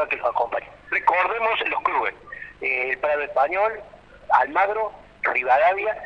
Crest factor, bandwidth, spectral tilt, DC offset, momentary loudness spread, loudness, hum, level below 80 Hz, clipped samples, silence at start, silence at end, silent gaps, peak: 18 dB; 7.4 kHz; -4.5 dB/octave; under 0.1%; 10 LU; -22 LUFS; 50 Hz at -55 dBFS; -56 dBFS; under 0.1%; 0 s; 0 s; none; -4 dBFS